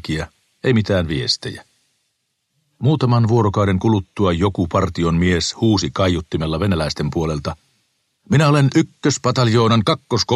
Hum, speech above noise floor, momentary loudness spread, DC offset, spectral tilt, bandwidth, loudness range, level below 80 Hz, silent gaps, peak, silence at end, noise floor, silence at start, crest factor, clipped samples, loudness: none; 54 dB; 8 LU; under 0.1%; -6 dB/octave; 12 kHz; 3 LU; -40 dBFS; none; -2 dBFS; 0 s; -71 dBFS; 0.05 s; 16 dB; under 0.1%; -18 LUFS